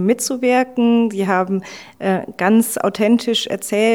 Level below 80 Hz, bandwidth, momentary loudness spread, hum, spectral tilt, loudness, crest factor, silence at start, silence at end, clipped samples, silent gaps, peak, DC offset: -64 dBFS; 17 kHz; 6 LU; none; -4.5 dB/octave; -17 LUFS; 14 dB; 0 s; 0 s; under 0.1%; none; -2 dBFS; 0.1%